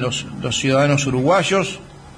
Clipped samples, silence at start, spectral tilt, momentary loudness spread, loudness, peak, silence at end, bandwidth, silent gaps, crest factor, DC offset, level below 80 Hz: under 0.1%; 0 s; -4.5 dB/octave; 9 LU; -18 LUFS; -6 dBFS; 0 s; 10.5 kHz; none; 14 dB; under 0.1%; -46 dBFS